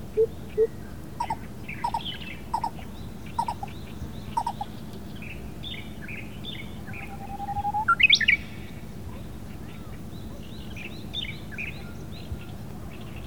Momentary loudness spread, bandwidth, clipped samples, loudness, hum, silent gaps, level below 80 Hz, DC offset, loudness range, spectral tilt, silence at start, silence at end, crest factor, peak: 15 LU; over 20 kHz; under 0.1%; -28 LUFS; none; none; -46 dBFS; 0.8%; 12 LU; -4 dB/octave; 0 s; 0 s; 24 dB; -8 dBFS